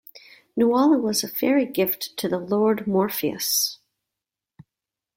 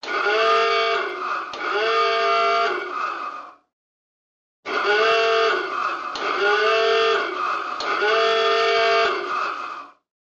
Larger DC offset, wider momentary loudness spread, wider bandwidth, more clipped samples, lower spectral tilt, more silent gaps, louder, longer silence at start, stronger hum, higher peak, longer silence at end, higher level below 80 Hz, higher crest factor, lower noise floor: neither; about the same, 8 LU vs 10 LU; first, 16.5 kHz vs 8 kHz; neither; first, -4 dB/octave vs -1.5 dB/octave; second, none vs 3.73-4.63 s; about the same, -22 LUFS vs -20 LUFS; about the same, 0.15 s vs 0.05 s; neither; about the same, -8 dBFS vs -8 dBFS; first, 1.4 s vs 0.4 s; about the same, -66 dBFS vs -70 dBFS; about the same, 16 dB vs 14 dB; about the same, -88 dBFS vs under -90 dBFS